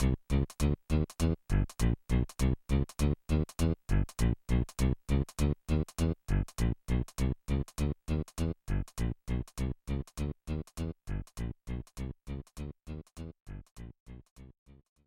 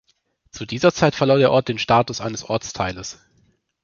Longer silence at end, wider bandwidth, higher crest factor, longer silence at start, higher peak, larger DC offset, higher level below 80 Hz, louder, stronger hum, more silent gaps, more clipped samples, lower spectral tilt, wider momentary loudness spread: about the same, 0.6 s vs 0.7 s; first, 15 kHz vs 7.2 kHz; about the same, 16 dB vs 18 dB; second, 0 s vs 0.55 s; second, -16 dBFS vs -2 dBFS; neither; first, -36 dBFS vs -50 dBFS; second, -34 LUFS vs -19 LUFS; neither; first, 13.42-13.46 s, 13.71-13.76 s, 14.00-14.06 s, 14.31-14.36 s vs none; neither; first, -7 dB/octave vs -5 dB/octave; about the same, 14 LU vs 15 LU